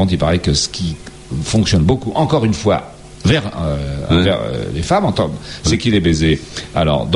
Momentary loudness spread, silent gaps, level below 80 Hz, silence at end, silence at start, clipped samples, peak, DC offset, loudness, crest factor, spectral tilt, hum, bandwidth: 8 LU; none; -30 dBFS; 0 s; 0 s; under 0.1%; -2 dBFS; under 0.1%; -16 LUFS; 14 dB; -5.5 dB/octave; none; 11.5 kHz